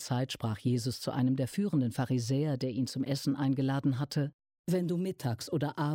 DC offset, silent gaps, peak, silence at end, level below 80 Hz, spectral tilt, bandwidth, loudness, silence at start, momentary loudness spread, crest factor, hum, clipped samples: under 0.1%; 4.33-4.39 s, 4.59-4.64 s; -18 dBFS; 0 s; -68 dBFS; -6.5 dB/octave; 17 kHz; -32 LUFS; 0 s; 4 LU; 12 dB; none; under 0.1%